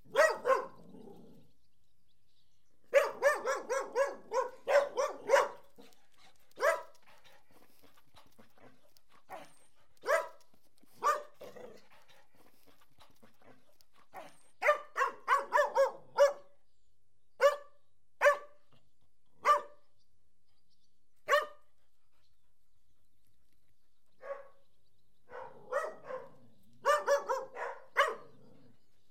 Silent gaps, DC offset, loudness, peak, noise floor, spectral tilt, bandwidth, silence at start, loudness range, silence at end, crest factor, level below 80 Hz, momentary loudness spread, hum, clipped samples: none; 0.2%; -32 LUFS; -14 dBFS; -80 dBFS; -1.5 dB/octave; 16.5 kHz; 0.15 s; 13 LU; 0.9 s; 22 dB; -82 dBFS; 22 LU; none; under 0.1%